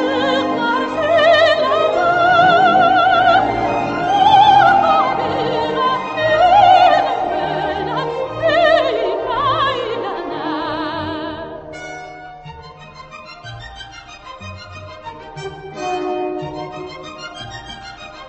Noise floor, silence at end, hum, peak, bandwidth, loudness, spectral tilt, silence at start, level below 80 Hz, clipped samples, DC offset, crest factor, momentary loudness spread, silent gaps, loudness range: -37 dBFS; 0 s; none; 0 dBFS; 8.2 kHz; -15 LUFS; -5 dB/octave; 0 s; -46 dBFS; under 0.1%; under 0.1%; 16 dB; 22 LU; none; 20 LU